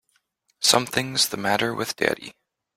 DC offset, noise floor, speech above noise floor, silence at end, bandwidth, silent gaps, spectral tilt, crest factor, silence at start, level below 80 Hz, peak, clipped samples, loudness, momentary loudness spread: under 0.1%; -69 dBFS; 46 dB; 0.45 s; 16.5 kHz; none; -2 dB/octave; 22 dB; 0.6 s; -62 dBFS; -2 dBFS; under 0.1%; -22 LUFS; 8 LU